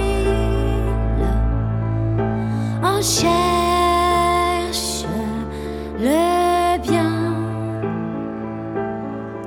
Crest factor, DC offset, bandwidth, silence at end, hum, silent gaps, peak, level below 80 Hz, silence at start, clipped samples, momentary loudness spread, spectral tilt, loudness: 14 dB; under 0.1%; 18 kHz; 0 s; none; none; -4 dBFS; -28 dBFS; 0 s; under 0.1%; 10 LU; -5 dB/octave; -20 LUFS